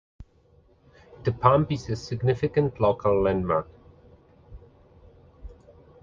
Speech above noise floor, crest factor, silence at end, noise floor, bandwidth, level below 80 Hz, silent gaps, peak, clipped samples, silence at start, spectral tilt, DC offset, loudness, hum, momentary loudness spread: 36 dB; 24 dB; 0.5 s; -59 dBFS; 7.4 kHz; -48 dBFS; none; -4 dBFS; under 0.1%; 0.2 s; -8 dB/octave; under 0.1%; -24 LUFS; none; 10 LU